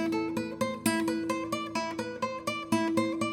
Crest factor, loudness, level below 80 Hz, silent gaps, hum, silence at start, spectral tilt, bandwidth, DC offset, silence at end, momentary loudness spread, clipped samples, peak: 18 dB; -31 LUFS; -66 dBFS; none; none; 0 s; -4.5 dB/octave; 18 kHz; under 0.1%; 0 s; 6 LU; under 0.1%; -12 dBFS